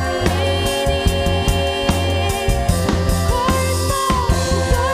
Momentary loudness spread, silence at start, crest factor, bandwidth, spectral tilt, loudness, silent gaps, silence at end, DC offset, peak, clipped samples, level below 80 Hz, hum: 1 LU; 0 s; 12 dB; 15.5 kHz; -4.5 dB/octave; -18 LUFS; none; 0 s; under 0.1%; -4 dBFS; under 0.1%; -24 dBFS; none